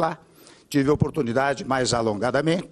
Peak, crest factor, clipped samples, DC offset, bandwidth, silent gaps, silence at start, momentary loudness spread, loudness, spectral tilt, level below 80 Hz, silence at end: -6 dBFS; 18 dB; under 0.1%; under 0.1%; 13 kHz; none; 0 s; 5 LU; -23 LUFS; -5.5 dB/octave; -50 dBFS; 0.05 s